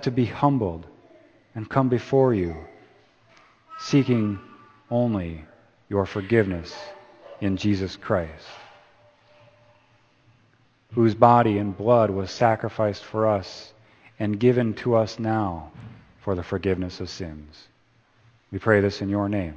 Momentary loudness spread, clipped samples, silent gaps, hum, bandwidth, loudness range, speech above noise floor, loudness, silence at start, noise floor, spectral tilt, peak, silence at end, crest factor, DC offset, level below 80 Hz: 18 LU; under 0.1%; none; none; 8 kHz; 9 LU; 39 dB; -23 LUFS; 0 s; -61 dBFS; -7.5 dB/octave; 0 dBFS; 0 s; 24 dB; under 0.1%; -54 dBFS